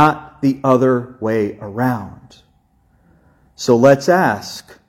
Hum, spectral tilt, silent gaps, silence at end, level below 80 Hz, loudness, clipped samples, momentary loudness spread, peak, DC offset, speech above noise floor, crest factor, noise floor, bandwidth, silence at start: none; -6.5 dB/octave; none; 0.3 s; -54 dBFS; -16 LUFS; under 0.1%; 13 LU; 0 dBFS; under 0.1%; 41 dB; 16 dB; -57 dBFS; 16.5 kHz; 0 s